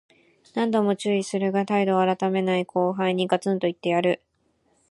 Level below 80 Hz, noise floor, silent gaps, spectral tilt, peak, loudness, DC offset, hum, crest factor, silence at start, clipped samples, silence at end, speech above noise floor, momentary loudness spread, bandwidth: -72 dBFS; -68 dBFS; none; -6 dB/octave; -6 dBFS; -24 LUFS; under 0.1%; none; 18 dB; 0.55 s; under 0.1%; 0.75 s; 45 dB; 4 LU; 11.5 kHz